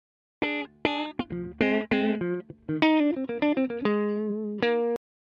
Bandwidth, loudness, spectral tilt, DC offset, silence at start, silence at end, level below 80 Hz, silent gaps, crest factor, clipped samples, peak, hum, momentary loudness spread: 6.6 kHz; -27 LUFS; -7.5 dB/octave; under 0.1%; 0.4 s; 0.25 s; -60 dBFS; none; 22 dB; under 0.1%; -6 dBFS; none; 9 LU